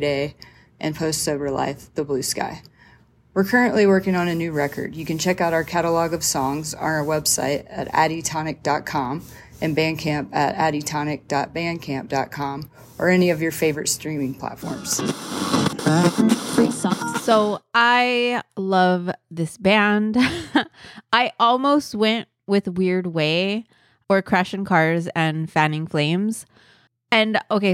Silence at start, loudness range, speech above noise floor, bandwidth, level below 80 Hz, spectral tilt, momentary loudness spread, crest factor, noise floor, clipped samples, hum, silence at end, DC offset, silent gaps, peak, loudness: 0 s; 4 LU; 32 dB; 16.5 kHz; -54 dBFS; -4.5 dB/octave; 10 LU; 18 dB; -53 dBFS; under 0.1%; none; 0 s; under 0.1%; none; -2 dBFS; -21 LUFS